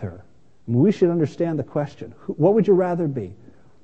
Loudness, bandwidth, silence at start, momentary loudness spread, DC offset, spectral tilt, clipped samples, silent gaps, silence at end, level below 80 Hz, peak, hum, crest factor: -21 LUFS; 8 kHz; 0 s; 18 LU; 0.4%; -9.5 dB/octave; under 0.1%; none; 0.5 s; -60 dBFS; -4 dBFS; none; 16 dB